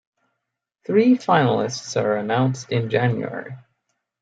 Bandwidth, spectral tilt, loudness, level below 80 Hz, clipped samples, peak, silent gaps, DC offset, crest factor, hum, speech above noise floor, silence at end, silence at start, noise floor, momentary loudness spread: 7.8 kHz; -6 dB/octave; -21 LUFS; -66 dBFS; under 0.1%; -4 dBFS; none; under 0.1%; 18 dB; none; 60 dB; 0.6 s; 0.9 s; -80 dBFS; 14 LU